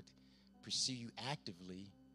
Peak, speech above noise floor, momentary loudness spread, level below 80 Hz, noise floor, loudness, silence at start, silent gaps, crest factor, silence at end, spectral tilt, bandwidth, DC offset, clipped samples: -26 dBFS; 22 dB; 18 LU; -78 dBFS; -67 dBFS; -43 LUFS; 0 s; none; 22 dB; 0 s; -2.5 dB/octave; 14.5 kHz; under 0.1%; under 0.1%